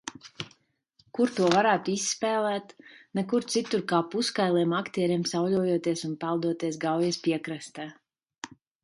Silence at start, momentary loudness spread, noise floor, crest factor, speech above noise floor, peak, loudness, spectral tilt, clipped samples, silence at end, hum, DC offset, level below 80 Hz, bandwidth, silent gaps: 0.05 s; 17 LU; -67 dBFS; 24 dB; 40 dB; -4 dBFS; -27 LUFS; -4.5 dB/octave; under 0.1%; 0.35 s; none; under 0.1%; -72 dBFS; 11.5 kHz; 8.38-8.42 s